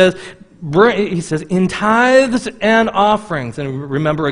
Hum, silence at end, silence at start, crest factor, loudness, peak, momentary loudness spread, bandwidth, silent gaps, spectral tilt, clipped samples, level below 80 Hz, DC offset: none; 0 s; 0 s; 14 dB; -15 LUFS; 0 dBFS; 12 LU; 10.5 kHz; none; -5.5 dB/octave; under 0.1%; -46 dBFS; under 0.1%